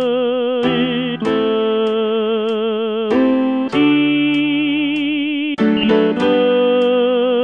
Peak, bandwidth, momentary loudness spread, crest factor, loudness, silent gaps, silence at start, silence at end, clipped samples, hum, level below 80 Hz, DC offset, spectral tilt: -2 dBFS; 7 kHz; 5 LU; 14 dB; -16 LUFS; none; 0 s; 0 s; under 0.1%; none; -54 dBFS; 0.2%; -7 dB/octave